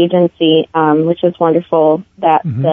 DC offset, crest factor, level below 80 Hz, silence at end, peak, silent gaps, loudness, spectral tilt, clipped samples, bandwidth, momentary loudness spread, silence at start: under 0.1%; 12 dB; -58 dBFS; 0 s; 0 dBFS; none; -13 LUFS; -10 dB/octave; under 0.1%; 3.8 kHz; 2 LU; 0 s